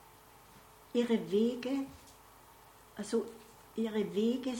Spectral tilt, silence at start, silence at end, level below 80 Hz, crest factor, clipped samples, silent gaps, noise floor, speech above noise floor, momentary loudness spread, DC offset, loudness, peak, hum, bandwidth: -5.5 dB/octave; 0.55 s; 0 s; -70 dBFS; 18 dB; under 0.1%; none; -58 dBFS; 25 dB; 20 LU; under 0.1%; -35 LUFS; -18 dBFS; none; 17.5 kHz